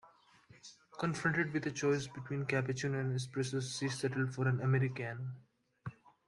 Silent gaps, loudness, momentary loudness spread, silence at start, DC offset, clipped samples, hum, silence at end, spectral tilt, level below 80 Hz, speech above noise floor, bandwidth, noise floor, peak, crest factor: none; -36 LUFS; 17 LU; 0.05 s; under 0.1%; under 0.1%; none; 0.35 s; -5.5 dB/octave; -72 dBFS; 28 dB; 11 kHz; -63 dBFS; -18 dBFS; 18 dB